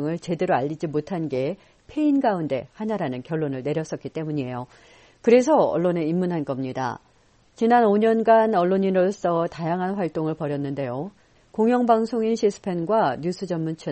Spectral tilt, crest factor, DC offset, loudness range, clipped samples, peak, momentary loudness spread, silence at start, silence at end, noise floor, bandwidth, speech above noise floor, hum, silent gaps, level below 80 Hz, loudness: -7 dB/octave; 18 dB; under 0.1%; 5 LU; under 0.1%; -6 dBFS; 12 LU; 0 s; 0 s; -59 dBFS; 8.4 kHz; 36 dB; none; none; -62 dBFS; -23 LUFS